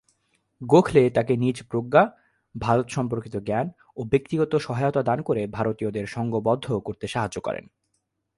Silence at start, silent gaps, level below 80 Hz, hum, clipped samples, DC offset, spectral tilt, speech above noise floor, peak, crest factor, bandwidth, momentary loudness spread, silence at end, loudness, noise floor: 0.6 s; none; -54 dBFS; none; under 0.1%; under 0.1%; -7 dB/octave; 52 dB; -4 dBFS; 20 dB; 11.5 kHz; 11 LU; 0.75 s; -24 LUFS; -75 dBFS